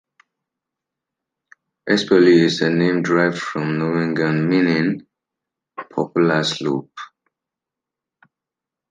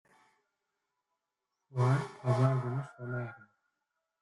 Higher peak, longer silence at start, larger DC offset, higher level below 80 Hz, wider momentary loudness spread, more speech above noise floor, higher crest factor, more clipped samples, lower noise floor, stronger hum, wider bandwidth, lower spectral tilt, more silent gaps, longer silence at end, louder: first, -2 dBFS vs -16 dBFS; first, 1.85 s vs 1.7 s; neither; about the same, -66 dBFS vs -70 dBFS; first, 21 LU vs 11 LU; first, 69 dB vs 56 dB; about the same, 18 dB vs 20 dB; neither; about the same, -86 dBFS vs -87 dBFS; neither; second, 9.4 kHz vs 11 kHz; second, -6 dB/octave vs -8 dB/octave; neither; first, 1.85 s vs 0.85 s; first, -18 LUFS vs -33 LUFS